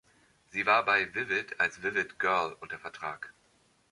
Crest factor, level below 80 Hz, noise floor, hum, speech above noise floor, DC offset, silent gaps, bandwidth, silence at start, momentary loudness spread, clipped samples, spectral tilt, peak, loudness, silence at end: 22 dB; -70 dBFS; -68 dBFS; none; 37 dB; under 0.1%; none; 11.5 kHz; 0.55 s; 16 LU; under 0.1%; -3.5 dB/octave; -10 dBFS; -29 LUFS; 0.6 s